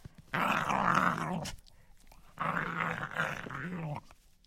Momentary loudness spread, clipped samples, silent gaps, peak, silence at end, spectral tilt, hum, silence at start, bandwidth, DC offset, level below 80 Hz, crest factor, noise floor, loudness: 12 LU; under 0.1%; none; -12 dBFS; 0.35 s; -5 dB/octave; none; 0.05 s; 16.5 kHz; under 0.1%; -58 dBFS; 24 dB; -57 dBFS; -33 LUFS